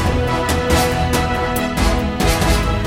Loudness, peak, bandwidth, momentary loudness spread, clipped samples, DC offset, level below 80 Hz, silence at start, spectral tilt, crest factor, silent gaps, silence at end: -17 LUFS; -2 dBFS; 17 kHz; 3 LU; under 0.1%; under 0.1%; -22 dBFS; 0 s; -5 dB/octave; 14 dB; none; 0 s